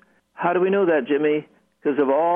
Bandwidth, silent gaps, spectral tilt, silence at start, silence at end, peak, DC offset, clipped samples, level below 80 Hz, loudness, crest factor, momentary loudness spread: 3.7 kHz; none; -9.5 dB/octave; 0.4 s; 0 s; -8 dBFS; under 0.1%; under 0.1%; -74 dBFS; -21 LUFS; 14 dB; 7 LU